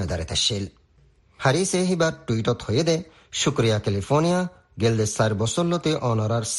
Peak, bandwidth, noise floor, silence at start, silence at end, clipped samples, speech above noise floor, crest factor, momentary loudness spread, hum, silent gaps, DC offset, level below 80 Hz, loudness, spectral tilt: -6 dBFS; 12 kHz; -58 dBFS; 0 s; 0 s; under 0.1%; 35 dB; 18 dB; 5 LU; none; none; under 0.1%; -48 dBFS; -23 LUFS; -4.5 dB/octave